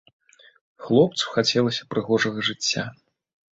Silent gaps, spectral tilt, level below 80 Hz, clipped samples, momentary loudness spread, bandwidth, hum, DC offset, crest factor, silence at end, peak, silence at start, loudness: none; -4 dB/octave; -62 dBFS; under 0.1%; 8 LU; 8 kHz; none; under 0.1%; 20 dB; 0.6 s; -4 dBFS; 0.8 s; -22 LUFS